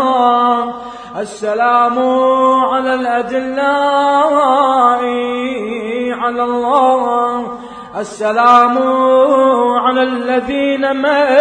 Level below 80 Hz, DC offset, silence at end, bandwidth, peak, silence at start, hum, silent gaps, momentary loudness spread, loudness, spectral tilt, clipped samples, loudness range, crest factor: -54 dBFS; under 0.1%; 0 s; 9.8 kHz; 0 dBFS; 0 s; none; none; 11 LU; -13 LUFS; -4 dB/octave; under 0.1%; 3 LU; 12 dB